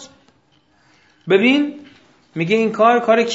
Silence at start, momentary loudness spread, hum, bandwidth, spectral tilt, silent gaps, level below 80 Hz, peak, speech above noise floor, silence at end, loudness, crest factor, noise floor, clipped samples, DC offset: 0 s; 14 LU; none; 8 kHz; -5.5 dB/octave; none; -66 dBFS; 0 dBFS; 43 dB; 0 s; -16 LUFS; 18 dB; -58 dBFS; under 0.1%; under 0.1%